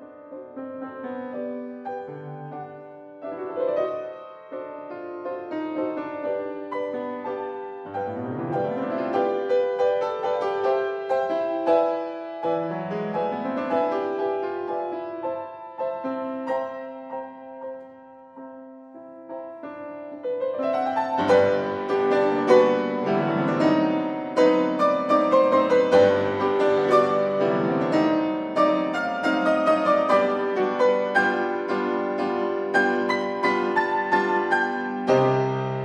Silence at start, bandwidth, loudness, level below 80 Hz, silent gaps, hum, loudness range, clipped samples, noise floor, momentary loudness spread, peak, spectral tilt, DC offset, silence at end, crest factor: 0 s; 9.6 kHz; -23 LUFS; -70 dBFS; none; none; 12 LU; under 0.1%; -46 dBFS; 17 LU; -4 dBFS; -6.5 dB/octave; under 0.1%; 0 s; 20 dB